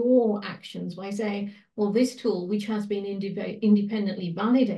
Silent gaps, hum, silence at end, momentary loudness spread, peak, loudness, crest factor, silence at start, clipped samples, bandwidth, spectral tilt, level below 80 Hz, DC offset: none; none; 0 s; 12 LU; -10 dBFS; -27 LUFS; 16 dB; 0 s; under 0.1%; 12 kHz; -7 dB/octave; -76 dBFS; under 0.1%